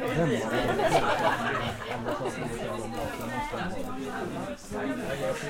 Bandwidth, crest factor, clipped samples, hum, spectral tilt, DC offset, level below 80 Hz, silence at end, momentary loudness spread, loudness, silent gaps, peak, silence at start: 16.5 kHz; 18 dB; under 0.1%; none; -5 dB/octave; under 0.1%; -48 dBFS; 0 s; 10 LU; -30 LUFS; none; -10 dBFS; 0 s